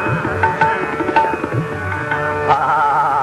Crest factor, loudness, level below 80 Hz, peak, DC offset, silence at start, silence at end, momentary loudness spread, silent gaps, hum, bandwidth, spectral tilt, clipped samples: 16 dB; -17 LUFS; -40 dBFS; 0 dBFS; under 0.1%; 0 s; 0 s; 7 LU; none; none; 12.5 kHz; -6.5 dB/octave; under 0.1%